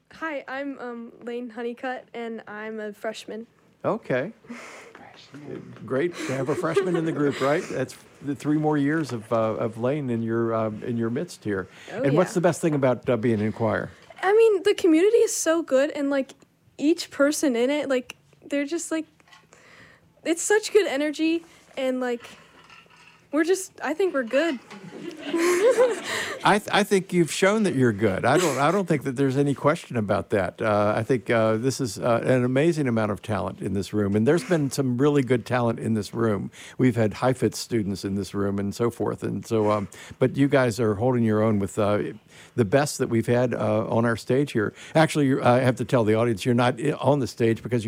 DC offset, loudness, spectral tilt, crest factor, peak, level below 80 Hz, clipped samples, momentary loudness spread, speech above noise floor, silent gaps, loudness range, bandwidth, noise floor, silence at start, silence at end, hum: under 0.1%; -24 LUFS; -5.5 dB/octave; 16 dB; -8 dBFS; -64 dBFS; under 0.1%; 13 LU; 30 dB; none; 6 LU; 16 kHz; -54 dBFS; 0.15 s; 0 s; none